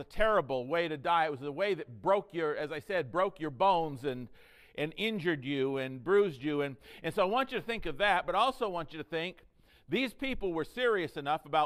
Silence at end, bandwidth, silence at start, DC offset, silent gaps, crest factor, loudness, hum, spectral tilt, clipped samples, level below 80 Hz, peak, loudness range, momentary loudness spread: 0 s; 15 kHz; 0 s; under 0.1%; none; 18 dB; -32 LUFS; none; -6 dB/octave; under 0.1%; -52 dBFS; -14 dBFS; 2 LU; 10 LU